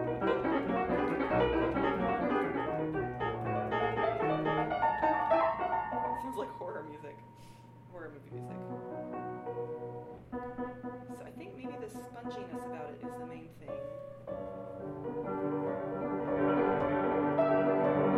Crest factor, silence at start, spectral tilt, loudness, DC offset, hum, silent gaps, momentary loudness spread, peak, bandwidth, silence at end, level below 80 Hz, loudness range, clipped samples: 16 dB; 0 s; -8 dB/octave; -34 LUFS; under 0.1%; none; none; 17 LU; -16 dBFS; 12.5 kHz; 0 s; -56 dBFS; 12 LU; under 0.1%